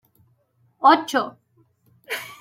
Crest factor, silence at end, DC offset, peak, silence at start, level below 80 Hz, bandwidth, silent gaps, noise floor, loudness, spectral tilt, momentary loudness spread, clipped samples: 20 dB; 0.05 s; under 0.1%; -4 dBFS; 0.8 s; -78 dBFS; 16.5 kHz; none; -64 dBFS; -21 LUFS; -3 dB/octave; 15 LU; under 0.1%